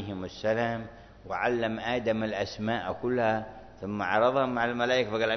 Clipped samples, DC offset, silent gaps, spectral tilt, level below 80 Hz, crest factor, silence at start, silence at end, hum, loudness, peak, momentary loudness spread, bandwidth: under 0.1%; under 0.1%; none; -6 dB/octave; -58 dBFS; 18 dB; 0 s; 0 s; none; -29 LUFS; -10 dBFS; 12 LU; 6.4 kHz